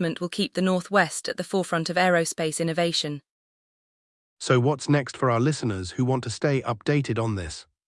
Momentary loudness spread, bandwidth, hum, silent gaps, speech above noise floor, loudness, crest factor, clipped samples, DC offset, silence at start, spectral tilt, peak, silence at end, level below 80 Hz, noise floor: 7 LU; 12 kHz; none; 3.29-4.37 s; over 66 dB; -25 LUFS; 18 dB; under 0.1%; under 0.1%; 0 s; -5 dB/octave; -8 dBFS; 0.25 s; -58 dBFS; under -90 dBFS